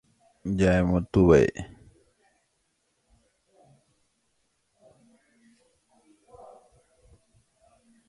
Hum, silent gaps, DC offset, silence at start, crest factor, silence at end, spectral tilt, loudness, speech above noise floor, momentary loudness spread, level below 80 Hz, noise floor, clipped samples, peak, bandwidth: none; none; under 0.1%; 0.45 s; 24 dB; 6.45 s; -7.5 dB/octave; -22 LUFS; 52 dB; 21 LU; -44 dBFS; -74 dBFS; under 0.1%; -6 dBFS; 11 kHz